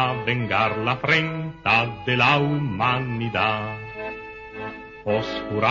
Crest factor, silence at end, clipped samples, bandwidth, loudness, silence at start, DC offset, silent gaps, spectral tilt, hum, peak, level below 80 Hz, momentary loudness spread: 18 dB; 0 s; under 0.1%; 7.4 kHz; -22 LUFS; 0 s; under 0.1%; none; -6.5 dB/octave; none; -6 dBFS; -52 dBFS; 15 LU